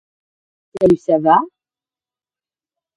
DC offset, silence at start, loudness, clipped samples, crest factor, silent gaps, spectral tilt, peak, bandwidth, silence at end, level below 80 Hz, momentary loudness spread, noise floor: under 0.1%; 0.75 s; -15 LUFS; under 0.1%; 18 dB; none; -8 dB/octave; 0 dBFS; 10.5 kHz; 1.5 s; -54 dBFS; 6 LU; under -90 dBFS